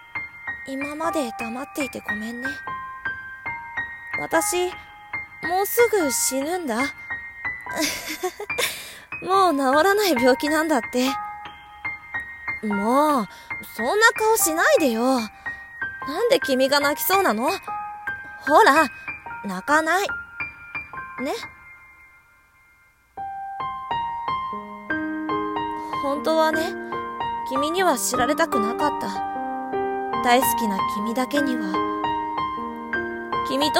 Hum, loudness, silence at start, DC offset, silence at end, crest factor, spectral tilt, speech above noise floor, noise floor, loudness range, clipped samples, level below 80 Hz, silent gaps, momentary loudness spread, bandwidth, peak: none; -23 LUFS; 0 s; under 0.1%; 0 s; 22 dB; -2.5 dB/octave; 36 dB; -57 dBFS; 9 LU; under 0.1%; -56 dBFS; none; 14 LU; 16.5 kHz; -2 dBFS